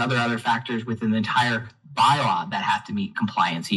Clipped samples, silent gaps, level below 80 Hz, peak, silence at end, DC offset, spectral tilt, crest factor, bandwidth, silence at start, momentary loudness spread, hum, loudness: under 0.1%; none; -68 dBFS; -6 dBFS; 0 s; under 0.1%; -5 dB/octave; 16 dB; 12 kHz; 0 s; 8 LU; none; -23 LUFS